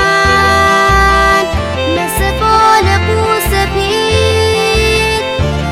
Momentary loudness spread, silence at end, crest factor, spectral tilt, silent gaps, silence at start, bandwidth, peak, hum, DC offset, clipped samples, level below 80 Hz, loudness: 6 LU; 0 s; 10 dB; -4 dB/octave; none; 0 s; 17 kHz; 0 dBFS; none; under 0.1%; under 0.1%; -22 dBFS; -10 LUFS